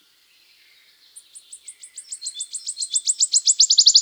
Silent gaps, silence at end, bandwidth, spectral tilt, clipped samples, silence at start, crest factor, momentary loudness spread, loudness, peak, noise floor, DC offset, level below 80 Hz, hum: none; 0 s; over 20 kHz; 8 dB/octave; under 0.1%; 1.35 s; 20 dB; 27 LU; -16 LUFS; -2 dBFS; -57 dBFS; under 0.1%; -90 dBFS; none